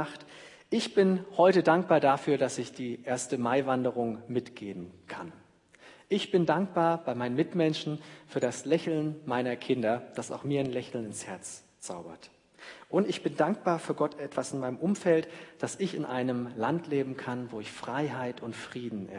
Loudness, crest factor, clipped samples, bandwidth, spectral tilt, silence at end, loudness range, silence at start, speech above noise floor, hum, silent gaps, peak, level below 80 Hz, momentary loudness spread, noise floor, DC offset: -30 LUFS; 20 dB; under 0.1%; 11 kHz; -5.5 dB/octave; 0 s; 7 LU; 0 s; 27 dB; none; none; -10 dBFS; -76 dBFS; 16 LU; -57 dBFS; under 0.1%